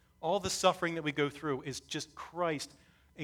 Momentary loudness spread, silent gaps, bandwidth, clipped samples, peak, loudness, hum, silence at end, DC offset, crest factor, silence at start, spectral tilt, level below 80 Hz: 11 LU; none; 19 kHz; under 0.1%; -12 dBFS; -34 LUFS; none; 0 s; under 0.1%; 22 dB; 0.2 s; -3.5 dB/octave; -64 dBFS